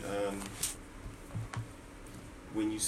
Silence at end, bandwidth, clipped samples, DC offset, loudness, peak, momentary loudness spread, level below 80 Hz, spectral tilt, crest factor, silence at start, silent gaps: 0 s; 16 kHz; under 0.1%; under 0.1%; -40 LUFS; -18 dBFS; 13 LU; -54 dBFS; -4 dB/octave; 22 dB; 0 s; none